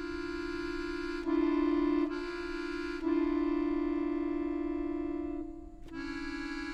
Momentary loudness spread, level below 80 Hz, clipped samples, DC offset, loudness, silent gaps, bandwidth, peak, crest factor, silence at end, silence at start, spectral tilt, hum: 10 LU; -50 dBFS; under 0.1%; under 0.1%; -34 LUFS; none; 8.6 kHz; -20 dBFS; 14 dB; 0 s; 0 s; -6 dB/octave; none